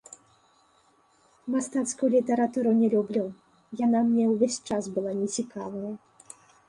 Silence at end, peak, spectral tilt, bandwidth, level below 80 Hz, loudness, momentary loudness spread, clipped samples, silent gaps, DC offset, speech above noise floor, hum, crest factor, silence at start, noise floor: 0.7 s; -10 dBFS; -5.5 dB/octave; 11.5 kHz; -70 dBFS; -26 LUFS; 14 LU; under 0.1%; none; under 0.1%; 38 dB; none; 16 dB; 1.45 s; -64 dBFS